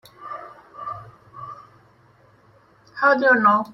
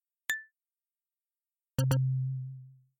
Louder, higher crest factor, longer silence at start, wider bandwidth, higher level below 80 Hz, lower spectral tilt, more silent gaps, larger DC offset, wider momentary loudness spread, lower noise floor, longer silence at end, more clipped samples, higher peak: first, -17 LUFS vs -33 LUFS; about the same, 20 dB vs 18 dB; about the same, 0.2 s vs 0.3 s; second, 12 kHz vs 16.5 kHz; second, -68 dBFS vs -62 dBFS; about the same, -6.5 dB/octave vs -5.5 dB/octave; neither; neither; first, 25 LU vs 14 LU; second, -55 dBFS vs under -90 dBFS; second, 0 s vs 0.3 s; neither; first, -4 dBFS vs -16 dBFS